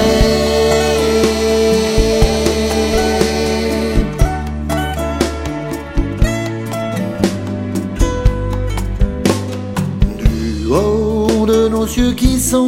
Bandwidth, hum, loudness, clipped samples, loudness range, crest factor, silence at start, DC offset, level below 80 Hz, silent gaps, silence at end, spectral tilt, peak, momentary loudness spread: 16.5 kHz; none; -16 LUFS; under 0.1%; 5 LU; 14 dB; 0 s; under 0.1%; -20 dBFS; none; 0 s; -5.5 dB/octave; 0 dBFS; 8 LU